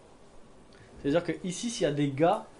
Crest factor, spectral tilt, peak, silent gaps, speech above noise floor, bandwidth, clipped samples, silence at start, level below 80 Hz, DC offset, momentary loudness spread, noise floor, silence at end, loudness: 18 dB; -5.5 dB/octave; -14 dBFS; none; 24 dB; 10.5 kHz; under 0.1%; 0.35 s; -58 dBFS; under 0.1%; 8 LU; -53 dBFS; 0 s; -29 LUFS